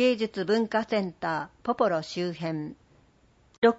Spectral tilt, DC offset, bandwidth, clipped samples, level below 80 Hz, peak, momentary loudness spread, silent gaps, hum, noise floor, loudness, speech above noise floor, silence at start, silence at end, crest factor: -6 dB/octave; under 0.1%; 8 kHz; under 0.1%; -66 dBFS; -8 dBFS; 8 LU; 3.58-3.62 s; none; -62 dBFS; -28 LUFS; 34 dB; 0 s; 0 s; 18 dB